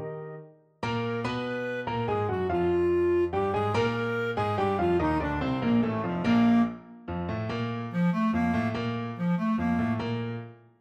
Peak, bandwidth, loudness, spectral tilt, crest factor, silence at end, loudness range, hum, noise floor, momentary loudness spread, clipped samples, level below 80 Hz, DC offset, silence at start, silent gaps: -14 dBFS; 8.6 kHz; -28 LUFS; -8 dB/octave; 14 dB; 0.25 s; 2 LU; none; -47 dBFS; 10 LU; under 0.1%; -50 dBFS; under 0.1%; 0 s; none